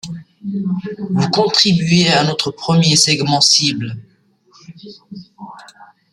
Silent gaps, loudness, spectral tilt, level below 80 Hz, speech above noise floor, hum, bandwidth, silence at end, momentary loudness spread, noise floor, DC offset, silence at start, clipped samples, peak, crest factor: none; -13 LUFS; -3.5 dB/octave; -54 dBFS; 37 dB; none; 13.5 kHz; 0.3 s; 22 LU; -52 dBFS; under 0.1%; 0.05 s; under 0.1%; 0 dBFS; 16 dB